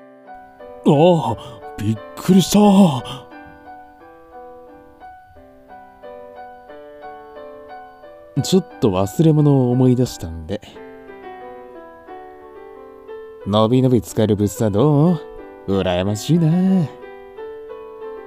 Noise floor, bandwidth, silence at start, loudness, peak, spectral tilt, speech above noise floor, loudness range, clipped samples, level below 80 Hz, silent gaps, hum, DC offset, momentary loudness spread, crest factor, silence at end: -45 dBFS; 16 kHz; 0.3 s; -17 LUFS; -2 dBFS; -7 dB/octave; 29 dB; 21 LU; under 0.1%; -48 dBFS; none; none; under 0.1%; 25 LU; 18 dB; 0 s